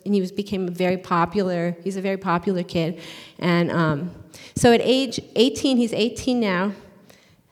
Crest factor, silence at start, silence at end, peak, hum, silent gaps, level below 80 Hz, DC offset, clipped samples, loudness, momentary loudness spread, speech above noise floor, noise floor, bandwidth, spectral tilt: 18 dB; 0.05 s; 0.65 s; -4 dBFS; none; none; -52 dBFS; under 0.1%; under 0.1%; -22 LUFS; 10 LU; 31 dB; -53 dBFS; 15 kHz; -5.5 dB/octave